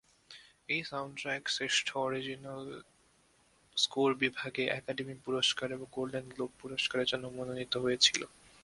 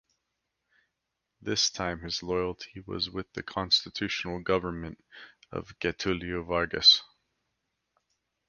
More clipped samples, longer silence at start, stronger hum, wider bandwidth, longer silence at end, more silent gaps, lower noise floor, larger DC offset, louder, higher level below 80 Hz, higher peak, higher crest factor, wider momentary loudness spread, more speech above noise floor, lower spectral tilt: neither; second, 0.3 s vs 1.45 s; neither; about the same, 11.5 kHz vs 10.5 kHz; second, 0.35 s vs 1.45 s; neither; second, -68 dBFS vs -84 dBFS; neither; second, -33 LUFS vs -27 LUFS; second, -70 dBFS vs -54 dBFS; second, -12 dBFS vs -8 dBFS; about the same, 24 dB vs 24 dB; second, 15 LU vs 20 LU; second, 34 dB vs 54 dB; about the same, -2.5 dB/octave vs -3 dB/octave